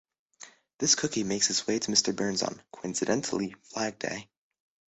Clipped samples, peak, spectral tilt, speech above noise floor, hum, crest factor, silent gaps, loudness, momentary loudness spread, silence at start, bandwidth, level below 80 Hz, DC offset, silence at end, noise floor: under 0.1%; -8 dBFS; -2.5 dB/octave; 24 dB; none; 24 dB; 0.74-0.79 s; -28 LUFS; 11 LU; 0.4 s; 8.4 kHz; -66 dBFS; under 0.1%; 0.7 s; -53 dBFS